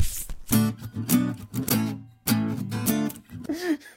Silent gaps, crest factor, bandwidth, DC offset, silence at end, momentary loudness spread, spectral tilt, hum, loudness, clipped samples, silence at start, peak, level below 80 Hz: none; 18 dB; 17 kHz; under 0.1%; 0.05 s; 9 LU; -5 dB/octave; none; -27 LUFS; under 0.1%; 0 s; -8 dBFS; -42 dBFS